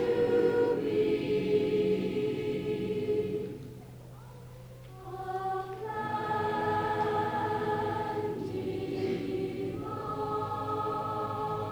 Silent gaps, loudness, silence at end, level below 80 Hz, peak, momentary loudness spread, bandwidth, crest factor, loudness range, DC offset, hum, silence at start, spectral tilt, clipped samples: none; -31 LUFS; 0 s; -58 dBFS; -16 dBFS; 18 LU; over 20 kHz; 16 dB; 7 LU; under 0.1%; none; 0 s; -7.5 dB/octave; under 0.1%